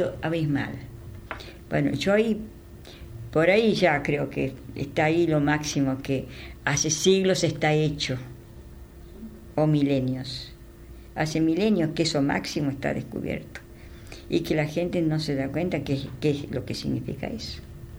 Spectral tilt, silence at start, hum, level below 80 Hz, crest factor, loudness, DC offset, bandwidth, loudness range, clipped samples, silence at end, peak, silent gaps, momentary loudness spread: -5 dB/octave; 0 s; none; -48 dBFS; 18 dB; -25 LUFS; under 0.1%; over 20 kHz; 5 LU; under 0.1%; 0 s; -8 dBFS; none; 21 LU